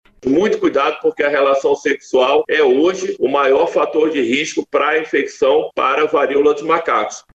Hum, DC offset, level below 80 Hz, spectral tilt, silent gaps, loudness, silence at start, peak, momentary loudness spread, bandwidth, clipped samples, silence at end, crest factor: none; under 0.1%; -56 dBFS; -4 dB/octave; none; -15 LUFS; 0.25 s; -2 dBFS; 4 LU; 8.2 kHz; under 0.1%; 0.15 s; 12 dB